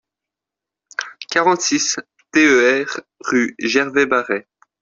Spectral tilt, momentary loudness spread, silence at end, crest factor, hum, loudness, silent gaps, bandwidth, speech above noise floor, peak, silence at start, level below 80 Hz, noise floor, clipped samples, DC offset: -2.5 dB/octave; 15 LU; 0.4 s; 16 dB; none; -17 LUFS; none; 7.8 kHz; 69 dB; -2 dBFS; 1 s; -62 dBFS; -86 dBFS; under 0.1%; under 0.1%